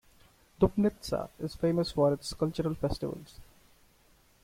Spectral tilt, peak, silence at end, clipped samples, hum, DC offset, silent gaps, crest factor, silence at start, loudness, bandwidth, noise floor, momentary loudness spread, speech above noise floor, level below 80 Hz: -7 dB/octave; -12 dBFS; 1 s; under 0.1%; none; under 0.1%; none; 20 dB; 0.6 s; -31 LUFS; 16.5 kHz; -64 dBFS; 10 LU; 34 dB; -50 dBFS